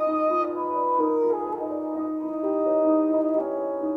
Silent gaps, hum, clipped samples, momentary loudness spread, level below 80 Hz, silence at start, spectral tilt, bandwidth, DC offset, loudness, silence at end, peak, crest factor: none; none; under 0.1%; 8 LU; -66 dBFS; 0 s; -8.5 dB/octave; 4.6 kHz; under 0.1%; -25 LUFS; 0 s; -10 dBFS; 14 dB